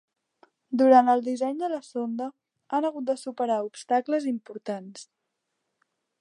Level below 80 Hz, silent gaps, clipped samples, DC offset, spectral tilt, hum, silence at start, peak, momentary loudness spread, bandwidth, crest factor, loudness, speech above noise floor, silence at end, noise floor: -84 dBFS; none; under 0.1%; under 0.1%; -5 dB/octave; none; 0.7 s; -6 dBFS; 17 LU; 11 kHz; 22 dB; -26 LUFS; 56 dB; 1.15 s; -81 dBFS